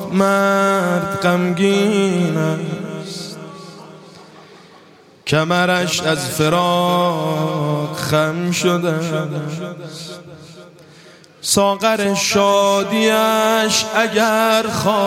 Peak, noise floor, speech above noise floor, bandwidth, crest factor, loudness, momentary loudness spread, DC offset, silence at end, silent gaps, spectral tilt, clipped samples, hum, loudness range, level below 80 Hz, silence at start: 0 dBFS; -46 dBFS; 30 dB; 16.5 kHz; 16 dB; -16 LUFS; 14 LU; under 0.1%; 0 s; none; -4.5 dB/octave; under 0.1%; none; 7 LU; -58 dBFS; 0 s